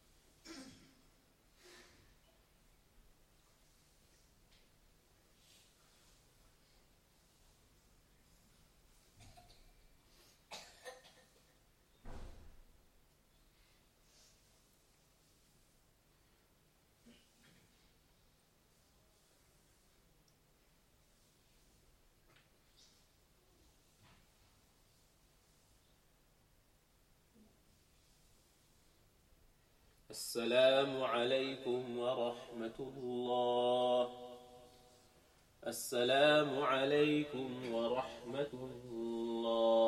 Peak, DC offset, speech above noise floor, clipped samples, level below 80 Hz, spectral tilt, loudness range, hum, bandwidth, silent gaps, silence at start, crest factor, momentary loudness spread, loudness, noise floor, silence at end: -18 dBFS; under 0.1%; 36 dB; under 0.1%; -70 dBFS; -4 dB/octave; 24 LU; none; 16.5 kHz; none; 0.45 s; 24 dB; 25 LU; -36 LUFS; -72 dBFS; 0 s